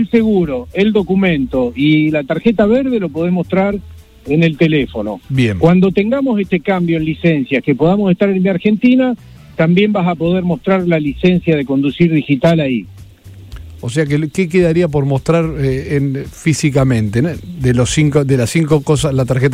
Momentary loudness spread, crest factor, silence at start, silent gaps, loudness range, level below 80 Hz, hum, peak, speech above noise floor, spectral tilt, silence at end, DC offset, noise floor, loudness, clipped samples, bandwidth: 6 LU; 12 dB; 0 s; none; 2 LU; -36 dBFS; none; 0 dBFS; 23 dB; -7 dB/octave; 0 s; under 0.1%; -36 dBFS; -14 LUFS; under 0.1%; 13.5 kHz